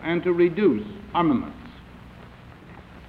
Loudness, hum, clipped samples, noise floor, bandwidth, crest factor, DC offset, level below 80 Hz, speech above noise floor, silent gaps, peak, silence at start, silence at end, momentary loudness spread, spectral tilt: -23 LUFS; none; under 0.1%; -45 dBFS; 4.9 kHz; 16 dB; under 0.1%; -50 dBFS; 23 dB; none; -8 dBFS; 0 s; 0 s; 25 LU; -9 dB/octave